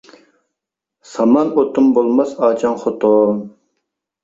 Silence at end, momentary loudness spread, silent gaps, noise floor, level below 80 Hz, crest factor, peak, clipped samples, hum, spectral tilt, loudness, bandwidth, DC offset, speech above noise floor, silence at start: 0.75 s; 8 LU; none; -82 dBFS; -60 dBFS; 14 dB; -2 dBFS; under 0.1%; none; -7.5 dB/octave; -15 LUFS; 7.8 kHz; under 0.1%; 68 dB; 1.1 s